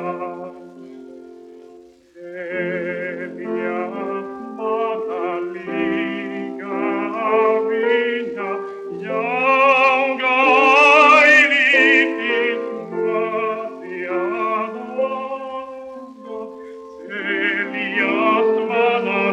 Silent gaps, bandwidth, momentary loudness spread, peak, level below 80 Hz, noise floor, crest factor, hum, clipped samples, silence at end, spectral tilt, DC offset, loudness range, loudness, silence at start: none; 9.4 kHz; 20 LU; 0 dBFS; -68 dBFS; -45 dBFS; 18 dB; none; under 0.1%; 0 s; -4.5 dB/octave; under 0.1%; 14 LU; -17 LUFS; 0 s